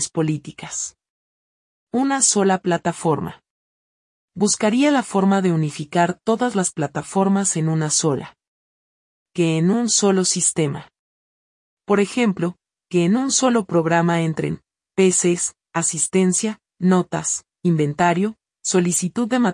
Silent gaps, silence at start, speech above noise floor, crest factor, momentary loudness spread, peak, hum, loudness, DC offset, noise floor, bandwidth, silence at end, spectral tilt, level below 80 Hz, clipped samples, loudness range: 1.10-1.87 s, 3.50-4.28 s, 8.48-9.26 s, 10.99-11.77 s; 0 s; over 71 dB; 16 dB; 10 LU; -4 dBFS; none; -19 LUFS; under 0.1%; under -90 dBFS; 12 kHz; 0 s; -4.5 dB/octave; -62 dBFS; under 0.1%; 2 LU